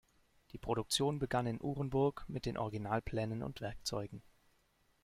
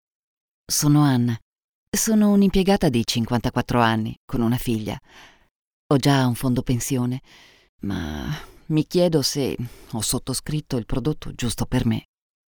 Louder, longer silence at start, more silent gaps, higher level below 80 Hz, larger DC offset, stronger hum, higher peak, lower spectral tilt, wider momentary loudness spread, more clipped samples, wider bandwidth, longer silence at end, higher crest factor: second, -38 LUFS vs -22 LUFS; second, 0.55 s vs 0.7 s; second, none vs 1.42-1.56 s, 1.64-1.92 s, 4.17-4.28 s, 5.51-5.90 s, 7.69-7.79 s; second, -58 dBFS vs -40 dBFS; neither; neither; second, -20 dBFS vs -4 dBFS; about the same, -5 dB/octave vs -5 dB/octave; about the same, 10 LU vs 12 LU; neither; second, 16 kHz vs over 20 kHz; first, 0.85 s vs 0.55 s; about the same, 18 dB vs 18 dB